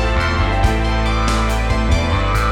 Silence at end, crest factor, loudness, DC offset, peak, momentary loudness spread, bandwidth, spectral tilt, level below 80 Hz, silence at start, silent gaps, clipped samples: 0 s; 12 dB; -17 LUFS; under 0.1%; -4 dBFS; 1 LU; 13 kHz; -5.5 dB/octave; -18 dBFS; 0 s; none; under 0.1%